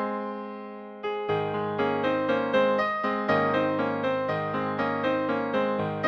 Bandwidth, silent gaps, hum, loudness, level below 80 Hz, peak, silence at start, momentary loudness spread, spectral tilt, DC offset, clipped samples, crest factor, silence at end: 6.4 kHz; none; none; -27 LUFS; -64 dBFS; -10 dBFS; 0 s; 10 LU; -7.5 dB/octave; under 0.1%; under 0.1%; 16 dB; 0 s